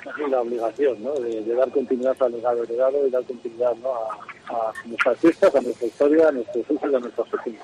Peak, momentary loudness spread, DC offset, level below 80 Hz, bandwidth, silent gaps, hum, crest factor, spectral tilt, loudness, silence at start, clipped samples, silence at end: -6 dBFS; 10 LU; under 0.1%; -68 dBFS; 11 kHz; none; none; 16 dB; -5.5 dB/octave; -22 LUFS; 0 s; under 0.1%; 0 s